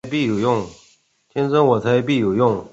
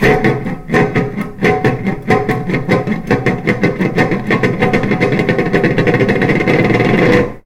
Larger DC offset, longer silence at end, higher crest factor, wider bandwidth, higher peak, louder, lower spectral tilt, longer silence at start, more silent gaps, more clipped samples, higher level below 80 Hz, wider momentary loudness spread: neither; about the same, 0.05 s vs 0.05 s; about the same, 16 dB vs 14 dB; second, 8 kHz vs 16 kHz; second, -4 dBFS vs 0 dBFS; second, -18 LUFS vs -14 LUFS; about the same, -7 dB/octave vs -7.5 dB/octave; about the same, 0.05 s vs 0 s; neither; neither; second, -54 dBFS vs -32 dBFS; first, 8 LU vs 5 LU